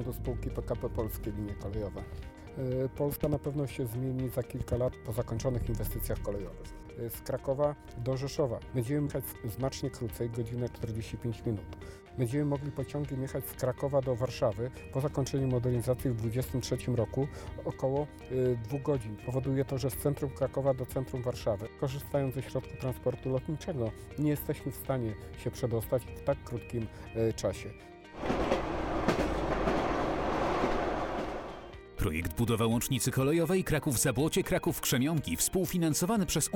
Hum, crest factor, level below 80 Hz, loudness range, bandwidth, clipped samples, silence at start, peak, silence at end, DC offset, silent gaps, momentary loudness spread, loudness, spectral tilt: none; 20 dB; -46 dBFS; 6 LU; 18 kHz; under 0.1%; 0 s; -12 dBFS; 0 s; under 0.1%; none; 9 LU; -33 LUFS; -5.5 dB/octave